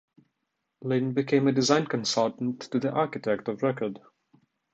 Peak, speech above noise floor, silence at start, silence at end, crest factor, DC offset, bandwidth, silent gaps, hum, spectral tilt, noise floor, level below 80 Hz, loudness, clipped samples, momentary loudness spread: -8 dBFS; 54 dB; 0.8 s; 0.75 s; 20 dB; under 0.1%; 8.4 kHz; none; none; -5 dB/octave; -81 dBFS; -72 dBFS; -27 LUFS; under 0.1%; 10 LU